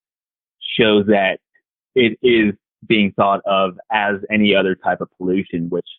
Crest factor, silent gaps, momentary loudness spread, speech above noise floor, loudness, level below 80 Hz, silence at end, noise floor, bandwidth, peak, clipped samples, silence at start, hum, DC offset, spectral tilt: 16 dB; none; 9 LU; over 73 dB; -17 LUFS; -54 dBFS; 0.05 s; under -90 dBFS; 4.2 kHz; -2 dBFS; under 0.1%; 0.6 s; none; under 0.1%; -3.5 dB/octave